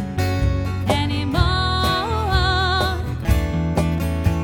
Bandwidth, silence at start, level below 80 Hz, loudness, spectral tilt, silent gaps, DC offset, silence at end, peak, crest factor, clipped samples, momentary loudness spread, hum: 18 kHz; 0 s; -26 dBFS; -20 LUFS; -6 dB/octave; none; under 0.1%; 0 s; -4 dBFS; 16 dB; under 0.1%; 3 LU; none